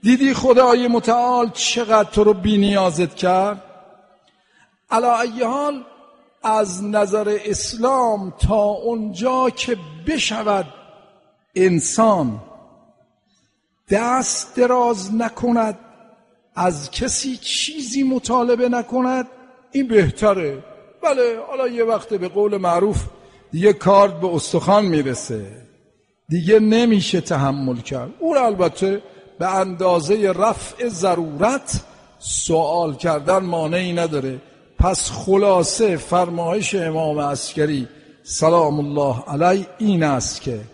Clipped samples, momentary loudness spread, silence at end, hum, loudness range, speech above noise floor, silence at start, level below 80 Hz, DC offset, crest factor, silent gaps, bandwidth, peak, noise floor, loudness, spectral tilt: under 0.1%; 10 LU; 0.05 s; none; 4 LU; 48 dB; 0.05 s; -38 dBFS; under 0.1%; 18 dB; none; 11 kHz; -2 dBFS; -66 dBFS; -19 LUFS; -4.5 dB/octave